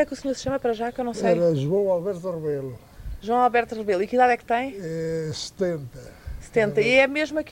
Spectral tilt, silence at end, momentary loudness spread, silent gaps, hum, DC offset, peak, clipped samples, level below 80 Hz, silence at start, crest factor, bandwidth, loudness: -5.5 dB/octave; 0 s; 17 LU; none; none; under 0.1%; -6 dBFS; under 0.1%; -46 dBFS; 0 s; 18 dB; 16 kHz; -23 LUFS